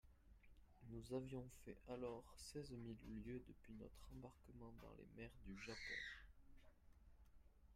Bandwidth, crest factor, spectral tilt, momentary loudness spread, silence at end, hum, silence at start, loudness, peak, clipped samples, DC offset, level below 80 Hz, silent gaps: 15.5 kHz; 20 dB; -5 dB/octave; 11 LU; 0 s; none; 0.05 s; -56 LUFS; -36 dBFS; under 0.1%; under 0.1%; -68 dBFS; none